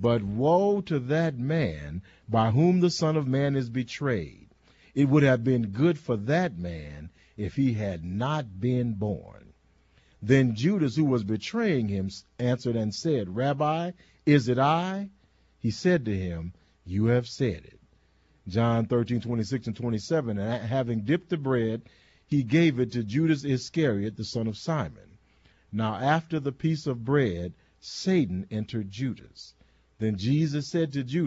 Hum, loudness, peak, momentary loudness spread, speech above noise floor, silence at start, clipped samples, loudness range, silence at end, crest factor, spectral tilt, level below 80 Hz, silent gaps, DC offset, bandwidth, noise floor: none; -27 LUFS; -8 dBFS; 13 LU; 37 dB; 0 s; under 0.1%; 4 LU; 0 s; 18 dB; -7 dB/octave; -56 dBFS; none; under 0.1%; 8 kHz; -63 dBFS